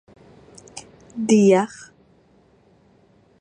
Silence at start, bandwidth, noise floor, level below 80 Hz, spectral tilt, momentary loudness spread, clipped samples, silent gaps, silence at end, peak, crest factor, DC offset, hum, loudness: 0.75 s; 10 kHz; -56 dBFS; -64 dBFS; -6 dB/octave; 25 LU; under 0.1%; none; 1.75 s; -4 dBFS; 20 dB; under 0.1%; none; -18 LUFS